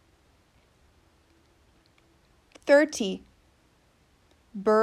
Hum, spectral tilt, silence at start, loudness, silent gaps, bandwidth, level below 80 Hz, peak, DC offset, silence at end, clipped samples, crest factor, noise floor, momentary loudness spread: none; -4 dB/octave; 2.65 s; -25 LUFS; none; 13 kHz; -66 dBFS; -8 dBFS; under 0.1%; 0 s; under 0.1%; 20 dB; -64 dBFS; 19 LU